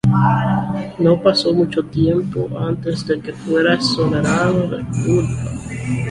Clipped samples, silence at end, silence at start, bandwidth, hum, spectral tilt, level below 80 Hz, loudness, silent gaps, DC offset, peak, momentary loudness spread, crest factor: under 0.1%; 0 s; 0.05 s; 11.5 kHz; none; -6.5 dB/octave; -40 dBFS; -18 LUFS; none; under 0.1%; -2 dBFS; 9 LU; 16 dB